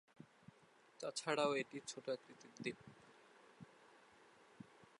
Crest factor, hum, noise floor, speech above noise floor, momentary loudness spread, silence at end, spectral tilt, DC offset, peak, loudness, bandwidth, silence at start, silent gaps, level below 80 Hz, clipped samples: 24 dB; none; -70 dBFS; 26 dB; 27 LU; 0.15 s; -3.5 dB/octave; under 0.1%; -24 dBFS; -44 LUFS; 11 kHz; 0.2 s; none; -88 dBFS; under 0.1%